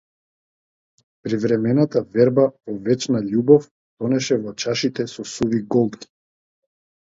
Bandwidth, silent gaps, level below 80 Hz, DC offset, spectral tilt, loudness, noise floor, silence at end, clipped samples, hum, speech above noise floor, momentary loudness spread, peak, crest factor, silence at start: 7.8 kHz; 3.71-3.97 s; -60 dBFS; under 0.1%; -6 dB/octave; -20 LUFS; under -90 dBFS; 1 s; under 0.1%; none; over 71 dB; 12 LU; 0 dBFS; 20 dB; 1.25 s